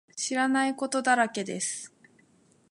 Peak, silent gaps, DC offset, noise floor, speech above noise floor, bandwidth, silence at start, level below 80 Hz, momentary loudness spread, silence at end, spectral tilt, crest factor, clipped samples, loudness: -10 dBFS; none; under 0.1%; -63 dBFS; 36 dB; 11.5 kHz; 0.15 s; -82 dBFS; 9 LU; 0.85 s; -2.5 dB/octave; 20 dB; under 0.1%; -27 LUFS